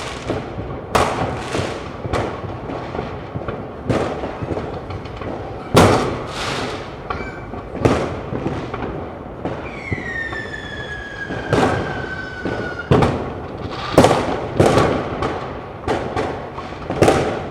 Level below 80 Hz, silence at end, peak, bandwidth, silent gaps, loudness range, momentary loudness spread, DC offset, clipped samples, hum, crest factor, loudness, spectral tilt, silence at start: -36 dBFS; 0 s; 0 dBFS; 16.5 kHz; none; 7 LU; 13 LU; under 0.1%; under 0.1%; none; 20 dB; -21 LUFS; -6 dB/octave; 0 s